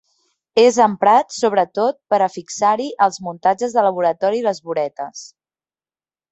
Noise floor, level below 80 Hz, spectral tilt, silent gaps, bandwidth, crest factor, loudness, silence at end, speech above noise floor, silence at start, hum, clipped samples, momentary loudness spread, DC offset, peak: under -90 dBFS; -68 dBFS; -4 dB/octave; none; 8.2 kHz; 16 dB; -17 LUFS; 1.05 s; over 73 dB; 0.55 s; none; under 0.1%; 9 LU; under 0.1%; -2 dBFS